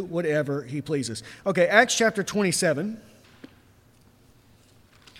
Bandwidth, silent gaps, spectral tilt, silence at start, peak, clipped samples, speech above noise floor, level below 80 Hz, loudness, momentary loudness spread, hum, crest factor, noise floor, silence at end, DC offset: 16 kHz; none; -4 dB/octave; 0 s; -2 dBFS; under 0.1%; 33 dB; -64 dBFS; -24 LUFS; 13 LU; none; 24 dB; -57 dBFS; 0 s; under 0.1%